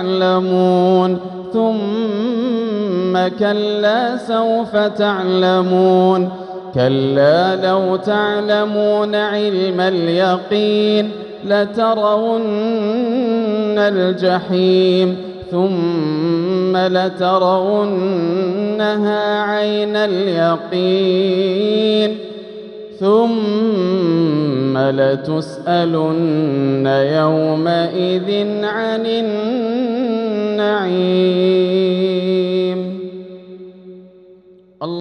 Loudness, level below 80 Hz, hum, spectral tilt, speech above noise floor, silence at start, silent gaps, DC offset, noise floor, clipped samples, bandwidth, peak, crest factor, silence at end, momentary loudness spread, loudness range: -16 LUFS; -62 dBFS; none; -7.5 dB/octave; 30 dB; 0 s; none; under 0.1%; -45 dBFS; under 0.1%; 9.6 kHz; -2 dBFS; 14 dB; 0 s; 5 LU; 2 LU